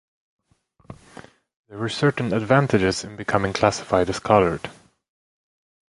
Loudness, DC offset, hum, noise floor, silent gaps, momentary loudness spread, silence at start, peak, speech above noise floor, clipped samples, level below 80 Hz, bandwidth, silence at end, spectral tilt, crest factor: -21 LUFS; under 0.1%; none; -61 dBFS; 1.56-1.64 s; 17 LU; 0.9 s; -2 dBFS; 41 dB; under 0.1%; -48 dBFS; 11.5 kHz; 1.15 s; -5.5 dB/octave; 22 dB